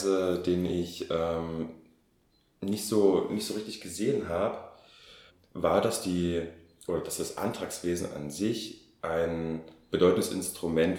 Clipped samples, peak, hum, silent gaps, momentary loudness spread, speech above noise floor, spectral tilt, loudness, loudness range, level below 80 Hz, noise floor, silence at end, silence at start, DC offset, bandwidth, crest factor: under 0.1%; -10 dBFS; none; none; 13 LU; 39 dB; -5 dB/octave; -30 LUFS; 3 LU; -58 dBFS; -68 dBFS; 0 s; 0 s; under 0.1%; 18 kHz; 20 dB